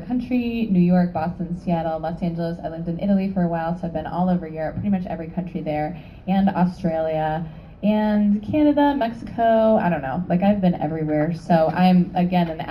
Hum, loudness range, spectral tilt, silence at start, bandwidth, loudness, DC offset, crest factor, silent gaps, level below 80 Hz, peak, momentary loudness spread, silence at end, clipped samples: none; 5 LU; -9.5 dB/octave; 0 s; 5.8 kHz; -21 LUFS; under 0.1%; 16 dB; none; -44 dBFS; -6 dBFS; 10 LU; 0 s; under 0.1%